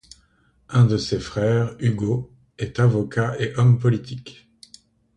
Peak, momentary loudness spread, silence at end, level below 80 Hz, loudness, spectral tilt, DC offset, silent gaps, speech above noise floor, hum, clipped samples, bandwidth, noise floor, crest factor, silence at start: -4 dBFS; 13 LU; 0.85 s; -50 dBFS; -21 LUFS; -7.5 dB/octave; under 0.1%; none; 41 dB; none; under 0.1%; 9.4 kHz; -61 dBFS; 18 dB; 0.7 s